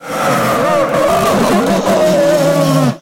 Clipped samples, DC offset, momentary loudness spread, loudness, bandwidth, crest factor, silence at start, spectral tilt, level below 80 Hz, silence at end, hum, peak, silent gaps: under 0.1%; under 0.1%; 2 LU; -12 LUFS; 16.5 kHz; 10 dB; 0 s; -5.5 dB/octave; -42 dBFS; 0 s; none; -2 dBFS; none